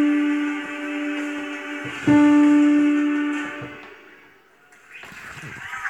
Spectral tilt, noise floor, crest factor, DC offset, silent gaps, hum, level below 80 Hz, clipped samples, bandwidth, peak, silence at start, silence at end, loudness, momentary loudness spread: -5.5 dB/octave; -53 dBFS; 14 dB; under 0.1%; none; none; -60 dBFS; under 0.1%; 8.8 kHz; -6 dBFS; 0 s; 0 s; -20 LUFS; 22 LU